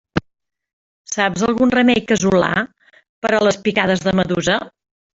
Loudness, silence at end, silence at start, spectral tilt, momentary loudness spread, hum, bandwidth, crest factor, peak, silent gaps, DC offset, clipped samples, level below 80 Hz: -17 LUFS; 0.5 s; 0.15 s; -4.5 dB/octave; 11 LU; none; 8 kHz; 16 dB; -2 dBFS; 0.73-1.05 s, 3.09-3.22 s; under 0.1%; under 0.1%; -48 dBFS